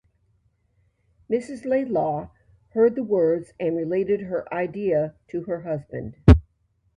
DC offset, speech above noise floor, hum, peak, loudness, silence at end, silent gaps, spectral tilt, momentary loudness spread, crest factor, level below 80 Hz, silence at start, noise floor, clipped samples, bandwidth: under 0.1%; 45 dB; none; 0 dBFS; -23 LUFS; 0.55 s; none; -9.5 dB/octave; 12 LU; 24 dB; -32 dBFS; 1.3 s; -67 dBFS; under 0.1%; 10 kHz